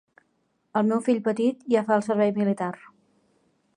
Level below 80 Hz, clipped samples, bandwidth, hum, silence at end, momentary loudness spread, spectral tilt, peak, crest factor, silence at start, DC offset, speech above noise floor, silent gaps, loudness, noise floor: -74 dBFS; under 0.1%; 10.5 kHz; none; 1.05 s; 8 LU; -7 dB/octave; -8 dBFS; 16 dB; 0.75 s; under 0.1%; 48 dB; none; -24 LUFS; -71 dBFS